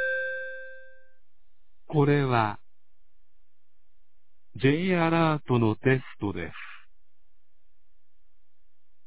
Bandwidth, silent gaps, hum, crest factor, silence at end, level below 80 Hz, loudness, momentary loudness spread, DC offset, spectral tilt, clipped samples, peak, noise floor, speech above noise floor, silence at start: 4 kHz; none; none; 22 dB; 2.3 s; -58 dBFS; -26 LUFS; 19 LU; 0.9%; -11 dB/octave; under 0.1%; -8 dBFS; -73 dBFS; 48 dB; 0 s